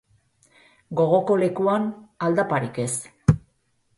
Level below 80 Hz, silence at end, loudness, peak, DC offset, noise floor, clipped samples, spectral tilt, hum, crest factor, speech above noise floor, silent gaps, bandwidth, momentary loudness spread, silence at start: -46 dBFS; 0.6 s; -23 LUFS; -4 dBFS; under 0.1%; -67 dBFS; under 0.1%; -6.5 dB/octave; none; 20 dB; 45 dB; none; 11.5 kHz; 8 LU; 0.9 s